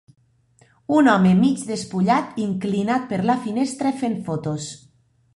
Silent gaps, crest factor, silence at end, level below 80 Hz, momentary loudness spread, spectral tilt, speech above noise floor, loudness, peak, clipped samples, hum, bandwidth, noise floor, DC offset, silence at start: none; 18 dB; 0.6 s; -58 dBFS; 11 LU; -6.5 dB/octave; 38 dB; -21 LUFS; -4 dBFS; under 0.1%; none; 11.5 kHz; -58 dBFS; under 0.1%; 0.9 s